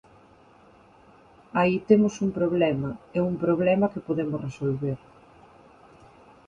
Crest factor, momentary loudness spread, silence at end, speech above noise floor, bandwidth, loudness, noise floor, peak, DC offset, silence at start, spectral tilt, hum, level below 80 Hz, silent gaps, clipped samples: 20 dB; 10 LU; 1.5 s; 31 dB; 7.6 kHz; -25 LUFS; -55 dBFS; -6 dBFS; under 0.1%; 1.55 s; -7.5 dB/octave; none; -58 dBFS; none; under 0.1%